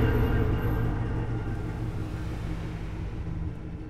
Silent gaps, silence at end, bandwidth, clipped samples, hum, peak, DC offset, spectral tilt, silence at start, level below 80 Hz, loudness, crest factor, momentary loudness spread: none; 0 s; 14 kHz; under 0.1%; none; -12 dBFS; under 0.1%; -8.5 dB/octave; 0 s; -34 dBFS; -31 LUFS; 16 dB; 9 LU